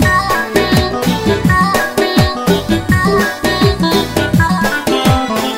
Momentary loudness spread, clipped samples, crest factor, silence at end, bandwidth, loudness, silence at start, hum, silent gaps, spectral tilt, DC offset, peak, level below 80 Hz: 3 LU; under 0.1%; 12 dB; 0 s; 16.5 kHz; -13 LUFS; 0 s; none; none; -5 dB/octave; under 0.1%; 0 dBFS; -28 dBFS